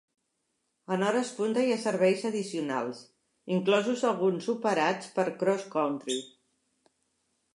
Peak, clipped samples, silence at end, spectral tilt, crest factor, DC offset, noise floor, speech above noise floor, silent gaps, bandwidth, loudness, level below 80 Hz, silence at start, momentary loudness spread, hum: -12 dBFS; under 0.1%; 1.25 s; -5 dB/octave; 18 dB; under 0.1%; -79 dBFS; 50 dB; none; 11.5 kHz; -29 LUFS; -84 dBFS; 0.9 s; 8 LU; none